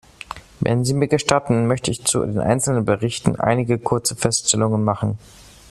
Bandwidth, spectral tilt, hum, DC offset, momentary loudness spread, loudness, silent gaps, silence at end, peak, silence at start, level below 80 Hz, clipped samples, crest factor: 13.5 kHz; -4.5 dB/octave; none; under 0.1%; 8 LU; -19 LUFS; none; 0.55 s; 0 dBFS; 0.3 s; -46 dBFS; under 0.1%; 20 dB